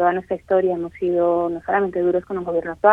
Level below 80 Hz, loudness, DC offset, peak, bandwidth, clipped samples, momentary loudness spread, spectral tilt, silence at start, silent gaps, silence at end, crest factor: -54 dBFS; -21 LUFS; under 0.1%; 0 dBFS; 3.8 kHz; under 0.1%; 5 LU; -8.5 dB/octave; 0 s; none; 0 s; 18 dB